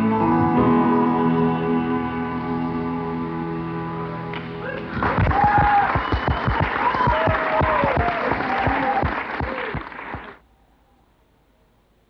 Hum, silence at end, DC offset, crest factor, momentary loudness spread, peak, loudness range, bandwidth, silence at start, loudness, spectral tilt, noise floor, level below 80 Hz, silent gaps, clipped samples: none; 1.75 s; under 0.1%; 16 dB; 12 LU; -6 dBFS; 7 LU; 6 kHz; 0 s; -21 LUFS; -9 dB/octave; -59 dBFS; -36 dBFS; none; under 0.1%